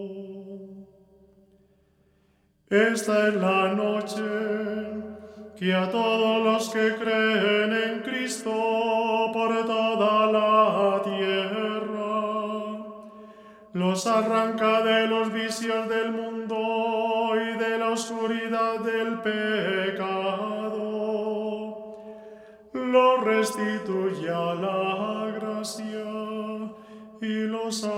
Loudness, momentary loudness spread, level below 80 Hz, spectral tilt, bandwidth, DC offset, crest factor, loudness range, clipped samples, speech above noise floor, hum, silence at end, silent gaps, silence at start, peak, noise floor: -25 LUFS; 15 LU; -70 dBFS; -4.5 dB/octave; 15.5 kHz; under 0.1%; 18 dB; 5 LU; under 0.1%; 41 dB; none; 0 s; none; 0 s; -8 dBFS; -65 dBFS